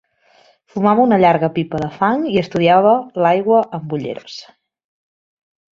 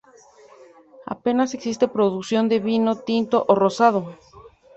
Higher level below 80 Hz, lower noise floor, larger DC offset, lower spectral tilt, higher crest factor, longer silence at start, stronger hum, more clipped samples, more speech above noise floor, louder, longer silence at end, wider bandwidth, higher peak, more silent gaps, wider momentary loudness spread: first, -56 dBFS vs -64 dBFS; about the same, -53 dBFS vs -50 dBFS; neither; first, -7.5 dB/octave vs -6 dB/octave; about the same, 16 dB vs 20 dB; second, 0.75 s vs 1 s; neither; neither; first, 38 dB vs 30 dB; first, -15 LUFS vs -21 LUFS; first, 1.35 s vs 0.3 s; second, 7.4 kHz vs 8.2 kHz; about the same, -2 dBFS vs -2 dBFS; neither; first, 15 LU vs 10 LU